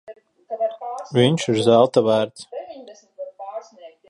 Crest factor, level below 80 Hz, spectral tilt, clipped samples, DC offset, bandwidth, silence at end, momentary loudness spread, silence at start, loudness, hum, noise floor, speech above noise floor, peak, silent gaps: 20 dB; -62 dBFS; -6 dB/octave; under 0.1%; under 0.1%; 11.5 kHz; 0.2 s; 22 LU; 0.1 s; -19 LUFS; none; -45 dBFS; 27 dB; -2 dBFS; none